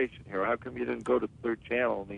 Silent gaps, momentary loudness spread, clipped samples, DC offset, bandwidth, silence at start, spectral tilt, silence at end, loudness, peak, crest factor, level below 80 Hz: none; 5 LU; under 0.1%; under 0.1%; 10 kHz; 0 s; -7 dB/octave; 0 s; -31 LUFS; -16 dBFS; 16 dB; -60 dBFS